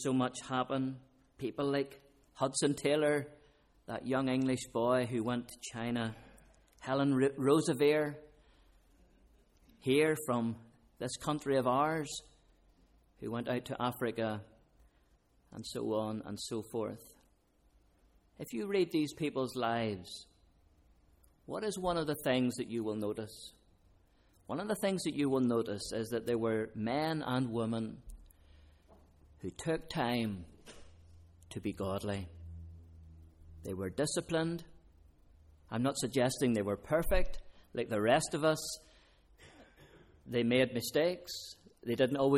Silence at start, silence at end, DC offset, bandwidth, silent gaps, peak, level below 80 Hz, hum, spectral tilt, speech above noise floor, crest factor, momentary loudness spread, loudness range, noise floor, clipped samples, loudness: 0 s; 0 s; under 0.1%; 16 kHz; none; -16 dBFS; -54 dBFS; none; -5 dB/octave; 36 dB; 20 dB; 17 LU; 7 LU; -70 dBFS; under 0.1%; -35 LUFS